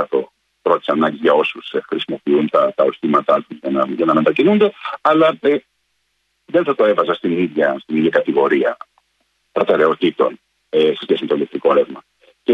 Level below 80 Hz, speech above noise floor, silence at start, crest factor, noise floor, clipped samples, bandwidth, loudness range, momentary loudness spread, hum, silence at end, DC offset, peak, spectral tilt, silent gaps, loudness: -62 dBFS; 52 dB; 0 s; 16 dB; -68 dBFS; under 0.1%; 7 kHz; 2 LU; 8 LU; none; 0 s; under 0.1%; -2 dBFS; -7.5 dB/octave; none; -17 LUFS